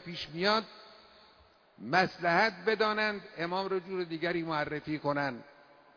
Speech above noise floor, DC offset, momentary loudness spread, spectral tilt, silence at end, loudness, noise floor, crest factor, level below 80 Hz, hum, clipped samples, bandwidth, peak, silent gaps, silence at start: 31 dB; under 0.1%; 11 LU; -5.5 dB/octave; 0.45 s; -31 LUFS; -62 dBFS; 22 dB; -68 dBFS; none; under 0.1%; 5.4 kHz; -12 dBFS; none; 0 s